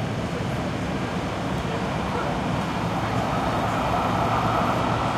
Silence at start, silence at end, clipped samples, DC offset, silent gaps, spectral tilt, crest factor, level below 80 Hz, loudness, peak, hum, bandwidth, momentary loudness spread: 0 s; 0 s; under 0.1%; under 0.1%; none; -6 dB/octave; 14 dB; -40 dBFS; -25 LUFS; -10 dBFS; none; 15 kHz; 5 LU